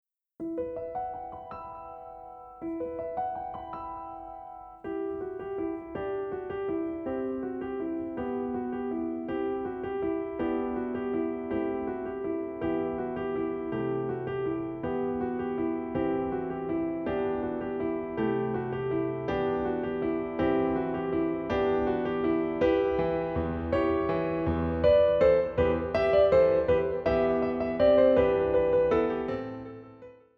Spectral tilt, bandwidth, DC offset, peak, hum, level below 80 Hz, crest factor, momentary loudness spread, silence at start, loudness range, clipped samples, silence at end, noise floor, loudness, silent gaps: -9 dB/octave; 6 kHz; under 0.1%; -12 dBFS; none; -50 dBFS; 18 dB; 15 LU; 0.4 s; 12 LU; under 0.1%; 0.25 s; -50 dBFS; -29 LUFS; none